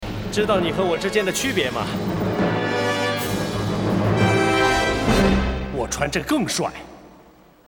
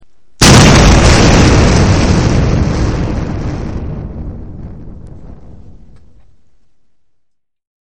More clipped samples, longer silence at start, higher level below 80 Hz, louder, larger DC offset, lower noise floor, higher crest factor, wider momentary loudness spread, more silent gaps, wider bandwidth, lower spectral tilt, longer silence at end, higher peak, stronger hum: second, under 0.1% vs 0.8%; second, 0 s vs 0.4 s; second, -34 dBFS vs -18 dBFS; second, -21 LUFS vs -9 LUFS; second, under 0.1% vs 2%; second, -50 dBFS vs -60 dBFS; about the same, 16 dB vs 12 dB; second, 7 LU vs 22 LU; neither; about the same, 19.5 kHz vs 20 kHz; about the same, -5 dB/octave vs -5 dB/octave; second, 0.55 s vs 2.45 s; second, -6 dBFS vs 0 dBFS; neither